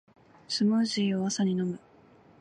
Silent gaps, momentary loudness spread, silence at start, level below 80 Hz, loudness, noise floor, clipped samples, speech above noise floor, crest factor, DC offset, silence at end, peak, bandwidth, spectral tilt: none; 9 LU; 0.5 s; -72 dBFS; -28 LUFS; -57 dBFS; under 0.1%; 30 dB; 12 dB; under 0.1%; 0.65 s; -16 dBFS; 10 kHz; -5 dB/octave